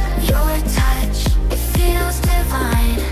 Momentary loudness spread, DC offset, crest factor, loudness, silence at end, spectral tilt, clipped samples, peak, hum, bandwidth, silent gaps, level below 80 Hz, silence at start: 1 LU; under 0.1%; 12 dB; -18 LUFS; 0 s; -5 dB/octave; under 0.1%; -4 dBFS; none; 16 kHz; none; -16 dBFS; 0 s